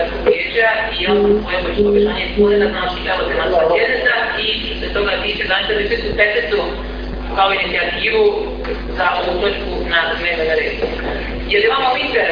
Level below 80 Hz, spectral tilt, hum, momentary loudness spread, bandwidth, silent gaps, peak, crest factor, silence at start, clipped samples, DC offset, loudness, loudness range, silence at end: -30 dBFS; -6.5 dB/octave; none; 8 LU; 5.2 kHz; none; 0 dBFS; 16 dB; 0 s; under 0.1%; under 0.1%; -16 LUFS; 2 LU; 0 s